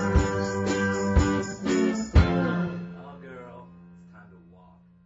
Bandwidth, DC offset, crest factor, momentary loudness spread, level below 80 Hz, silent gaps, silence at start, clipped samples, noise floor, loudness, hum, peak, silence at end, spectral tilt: 8 kHz; under 0.1%; 20 dB; 20 LU; -32 dBFS; none; 0 s; under 0.1%; -54 dBFS; -25 LUFS; none; -6 dBFS; 0.85 s; -6.5 dB/octave